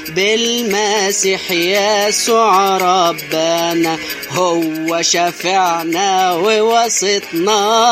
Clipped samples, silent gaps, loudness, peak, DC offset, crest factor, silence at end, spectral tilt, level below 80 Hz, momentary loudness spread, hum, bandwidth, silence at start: under 0.1%; none; -14 LUFS; 0 dBFS; under 0.1%; 14 dB; 0 s; -2 dB/octave; -58 dBFS; 4 LU; none; 15.5 kHz; 0 s